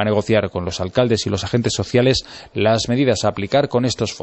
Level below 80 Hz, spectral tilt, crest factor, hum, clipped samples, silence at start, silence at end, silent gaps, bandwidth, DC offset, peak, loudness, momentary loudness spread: -44 dBFS; -5 dB/octave; 16 dB; none; under 0.1%; 0 s; 0 s; none; 8.4 kHz; under 0.1%; -2 dBFS; -18 LUFS; 5 LU